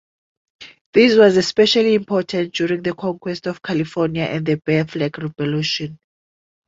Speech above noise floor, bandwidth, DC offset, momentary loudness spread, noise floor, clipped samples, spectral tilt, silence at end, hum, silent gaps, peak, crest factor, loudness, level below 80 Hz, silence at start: over 72 dB; 7.8 kHz; under 0.1%; 12 LU; under -90 dBFS; under 0.1%; -5.5 dB/octave; 0.75 s; none; 0.81-0.93 s; -2 dBFS; 18 dB; -18 LUFS; -56 dBFS; 0.6 s